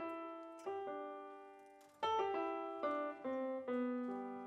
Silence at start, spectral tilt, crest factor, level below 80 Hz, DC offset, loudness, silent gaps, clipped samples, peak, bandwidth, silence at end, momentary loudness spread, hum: 0 s; -5 dB/octave; 18 dB; under -90 dBFS; under 0.1%; -43 LUFS; none; under 0.1%; -26 dBFS; 11 kHz; 0 s; 16 LU; none